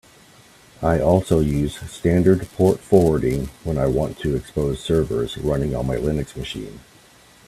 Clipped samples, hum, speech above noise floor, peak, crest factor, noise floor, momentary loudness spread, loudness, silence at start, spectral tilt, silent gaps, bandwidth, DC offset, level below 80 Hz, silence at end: under 0.1%; none; 30 dB; 0 dBFS; 20 dB; -50 dBFS; 10 LU; -21 LUFS; 0.8 s; -7.5 dB/octave; none; 14.5 kHz; under 0.1%; -36 dBFS; 0.7 s